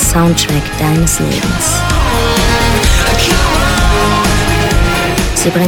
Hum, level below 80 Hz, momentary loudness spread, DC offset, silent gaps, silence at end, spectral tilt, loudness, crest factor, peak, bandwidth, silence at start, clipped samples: none; -16 dBFS; 3 LU; under 0.1%; none; 0 s; -4 dB/octave; -11 LUFS; 10 dB; 0 dBFS; 19.5 kHz; 0 s; under 0.1%